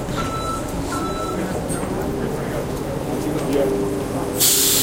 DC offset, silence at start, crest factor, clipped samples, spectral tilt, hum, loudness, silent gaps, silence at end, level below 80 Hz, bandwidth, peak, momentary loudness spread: under 0.1%; 0 s; 20 dB; under 0.1%; -3.5 dB/octave; none; -21 LUFS; none; 0 s; -36 dBFS; 16.5 kHz; -2 dBFS; 10 LU